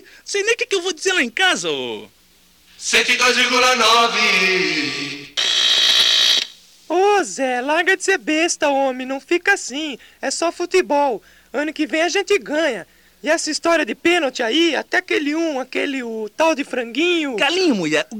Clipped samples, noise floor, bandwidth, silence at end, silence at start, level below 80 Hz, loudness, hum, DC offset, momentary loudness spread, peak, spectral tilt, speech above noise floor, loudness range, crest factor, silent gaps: under 0.1%; -53 dBFS; 17 kHz; 0 s; 0.25 s; -60 dBFS; -17 LUFS; none; under 0.1%; 12 LU; -6 dBFS; -1.5 dB/octave; 35 dB; 6 LU; 12 dB; none